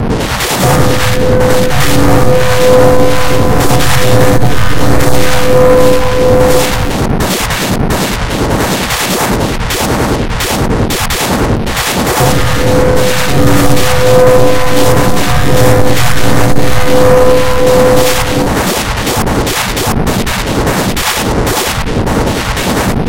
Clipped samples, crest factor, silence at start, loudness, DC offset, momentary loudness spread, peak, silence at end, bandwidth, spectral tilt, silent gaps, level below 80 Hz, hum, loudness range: 1%; 10 dB; 0 s; -10 LUFS; 20%; 6 LU; 0 dBFS; 0 s; 17 kHz; -4.5 dB/octave; none; -20 dBFS; none; 3 LU